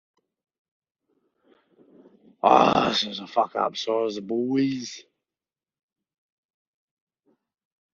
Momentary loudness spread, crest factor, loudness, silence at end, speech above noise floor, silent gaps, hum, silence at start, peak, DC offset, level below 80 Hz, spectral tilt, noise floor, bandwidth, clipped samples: 11 LU; 26 dB; -23 LUFS; 2.9 s; over 67 dB; none; none; 2.45 s; -2 dBFS; under 0.1%; -66 dBFS; -3 dB/octave; under -90 dBFS; 7.2 kHz; under 0.1%